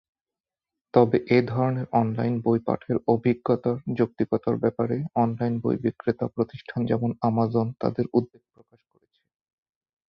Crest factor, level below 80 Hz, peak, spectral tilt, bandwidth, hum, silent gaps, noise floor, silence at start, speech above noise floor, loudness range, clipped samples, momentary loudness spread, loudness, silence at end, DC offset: 22 dB; -60 dBFS; -4 dBFS; -10.5 dB/octave; 5.8 kHz; none; none; under -90 dBFS; 0.95 s; over 66 dB; 4 LU; under 0.1%; 6 LU; -25 LUFS; 1.85 s; under 0.1%